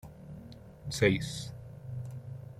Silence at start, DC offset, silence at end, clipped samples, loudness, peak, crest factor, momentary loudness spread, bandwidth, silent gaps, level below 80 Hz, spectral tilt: 0.05 s; under 0.1%; 0 s; under 0.1%; -33 LUFS; -10 dBFS; 24 dB; 21 LU; 15.5 kHz; none; -56 dBFS; -5 dB/octave